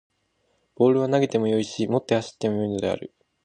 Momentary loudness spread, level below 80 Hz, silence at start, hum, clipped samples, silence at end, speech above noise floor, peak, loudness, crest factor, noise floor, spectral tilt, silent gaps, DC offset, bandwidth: 7 LU; -60 dBFS; 0.8 s; none; under 0.1%; 0.35 s; 47 dB; -6 dBFS; -24 LUFS; 18 dB; -70 dBFS; -6.5 dB/octave; none; under 0.1%; 9.8 kHz